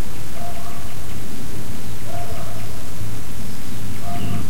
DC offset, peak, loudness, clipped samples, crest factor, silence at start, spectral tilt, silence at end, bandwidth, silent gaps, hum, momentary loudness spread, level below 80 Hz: 30%; -6 dBFS; -31 LUFS; under 0.1%; 18 dB; 0 s; -5 dB/octave; 0 s; 16.5 kHz; none; none; 3 LU; -40 dBFS